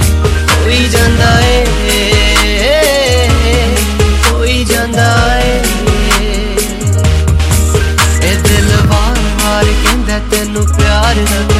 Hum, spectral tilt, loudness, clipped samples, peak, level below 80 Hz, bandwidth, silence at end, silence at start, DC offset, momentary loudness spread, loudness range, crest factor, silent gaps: none; -4.5 dB/octave; -10 LUFS; under 0.1%; 0 dBFS; -14 dBFS; 16 kHz; 0 s; 0 s; under 0.1%; 4 LU; 2 LU; 10 dB; none